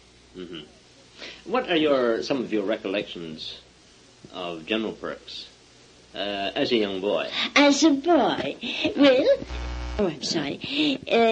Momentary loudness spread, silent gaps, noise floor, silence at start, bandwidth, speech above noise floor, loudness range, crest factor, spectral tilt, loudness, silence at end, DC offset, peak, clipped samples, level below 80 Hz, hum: 20 LU; none; -53 dBFS; 0.35 s; 9.2 kHz; 30 dB; 11 LU; 20 dB; -4 dB/octave; -24 LUFS; 0 s; under 0.1%; -6 dBFS; under 0.1%; -46 dBFS; none